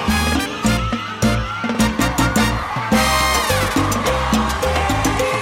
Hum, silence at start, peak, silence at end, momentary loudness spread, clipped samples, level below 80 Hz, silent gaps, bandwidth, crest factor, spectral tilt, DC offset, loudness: none; 0 s; -6 dBFS; 0 s; 4 LU; under 0.1%; -28 dBFS; none; 17 kHz; 12 dB; -4 dB/octave; under 0.1%; -18 LUFS